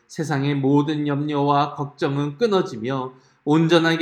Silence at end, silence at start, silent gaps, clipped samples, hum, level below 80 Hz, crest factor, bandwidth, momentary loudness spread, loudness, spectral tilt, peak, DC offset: 0 s; 0.1 s; none; under 0.1%; none; -68 dBFS; 18 dB; 11 kHz; 10 LU; -21 LUFS; -6.5 dB/octave; -2 dBFS; under 0.1%